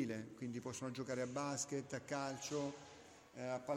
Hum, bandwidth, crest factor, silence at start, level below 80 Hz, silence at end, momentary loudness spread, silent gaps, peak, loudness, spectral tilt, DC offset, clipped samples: none; 16.5 kHz; 16 dB; 0 s; -78 dBFS; 0 s; 12 LU; none; -28 dBFS; -44 LUFS; -4.5 dB/octave; under 0.1%; under 0.1%